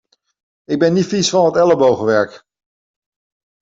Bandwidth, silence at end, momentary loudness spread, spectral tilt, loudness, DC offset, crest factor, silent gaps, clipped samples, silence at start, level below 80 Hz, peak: 8 kHz; 1.25 s; 7 LU; -5 dB/octave; -15 LUFS; under 0.1%; 14 dB; none; under 0.1%; 0.7 s; -58 dBFS; -2 dBFS